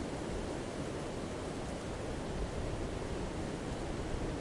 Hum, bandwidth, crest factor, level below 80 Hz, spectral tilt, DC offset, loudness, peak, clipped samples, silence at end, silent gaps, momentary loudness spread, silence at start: none; 11.5 kHz; 14 dB; -46 dBFS; -5.5 dB/octave; under 0.1%; -40 LUFS; -24 dBFS; under 0.1%; 0 s; none; 1 LU; 0 s